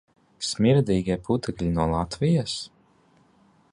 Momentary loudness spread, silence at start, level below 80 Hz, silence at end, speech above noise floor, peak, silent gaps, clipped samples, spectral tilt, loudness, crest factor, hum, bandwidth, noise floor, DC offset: 11 LU; 0.4 s; -44 dBFS; 1.05 s; 37 dB; -8 dBFS; none; under 0.1%; -6 dB/octave; -25 LUFS; 16 dB; none; 11.5 kHz; -60 dBFS; under 0.1%